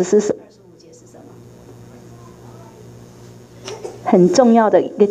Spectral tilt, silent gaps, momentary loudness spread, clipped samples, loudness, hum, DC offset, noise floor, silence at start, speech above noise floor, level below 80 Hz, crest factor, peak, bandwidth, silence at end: -6 dB/octave; none; 20 LU; under 0.1%; -14 LUFS; none; under 0.1%; -45 dBFS; 0 s; 32 dB; -58 dBFS; 18 dB; 0 dBFS; 9.8 kHz; 0 s